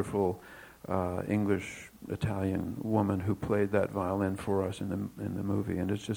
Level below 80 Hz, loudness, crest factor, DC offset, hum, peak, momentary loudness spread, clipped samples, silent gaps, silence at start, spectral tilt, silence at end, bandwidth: -58 dBFS; -32 LUFS; 20 dB; under 0.1%; none; -12 dBFS; 9 LU; under 0.1%; none; 0 s; -7.5 dB/octave; 0 s; 19.5 kHz